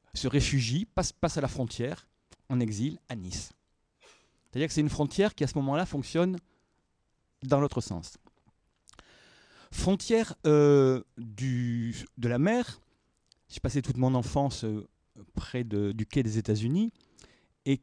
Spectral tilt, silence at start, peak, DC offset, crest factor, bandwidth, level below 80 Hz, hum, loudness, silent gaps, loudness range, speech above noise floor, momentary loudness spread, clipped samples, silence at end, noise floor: -6 dB/octave; 0.15 s; -10 dBFS; under 0.1%; 20 dB; 10.5 kHz; -48 dBFS; none; -29 LUFS; none; 7 LU; 46 dB; 13 LU; under 0.1%; 0.05 s; -75 dBFS